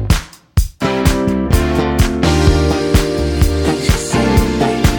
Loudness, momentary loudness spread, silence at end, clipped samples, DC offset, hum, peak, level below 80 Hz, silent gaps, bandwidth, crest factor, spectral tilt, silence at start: -15 LUFS; 5 LU; 0 s; under 0.1%; under 0.1%; none; 0 dBFS; -20 dBFS; none; over 20 kHz; 14 dB; -5.5 dB/octave; 0 s